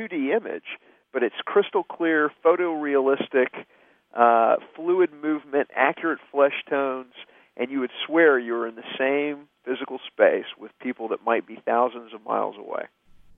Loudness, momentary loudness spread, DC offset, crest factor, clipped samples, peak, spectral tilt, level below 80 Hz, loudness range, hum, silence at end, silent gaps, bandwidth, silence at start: -24 LUFS; 15 LU; under 0.1%; 22 dB; under 0.1%; -2 dBFS; -8 dB/octave; -74 dBFS; 3 LU; none; 0.5 s; none; 3.8 kHz; 0 s